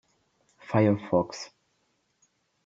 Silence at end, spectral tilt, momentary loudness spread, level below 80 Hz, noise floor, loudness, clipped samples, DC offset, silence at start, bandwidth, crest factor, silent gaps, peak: 1.2 s; -7 dB/octave; 17 LU; -68 dBFS; -73 dBFS; -26 LUFS; under 0.1%; under 0.1%; 0.7 s; 7.8 kHz; 20 dB; none; -10 dBFS